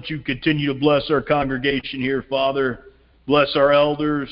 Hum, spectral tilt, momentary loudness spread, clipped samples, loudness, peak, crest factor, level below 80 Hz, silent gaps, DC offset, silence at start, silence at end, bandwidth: none; -10.5 dB/octave; 8 LU; under 0.1%; -20 LUFS; -4 dBFS; 16 dB; -46 dBFS; none; under 0.1%; 0 s; 0 s; 5.6 kHz